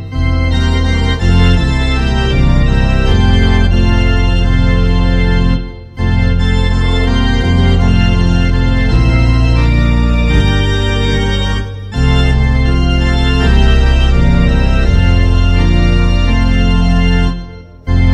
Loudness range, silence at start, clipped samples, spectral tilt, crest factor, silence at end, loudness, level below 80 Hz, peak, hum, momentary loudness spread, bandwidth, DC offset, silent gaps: 2 LU; 0 s; under 0.1%; -7 dB/octave; 10 dB; 0 s; -12 LUFS; -12 dBFS; 0 dBFS; none; 4 LU; 8.8 kHz; under 0.1%; none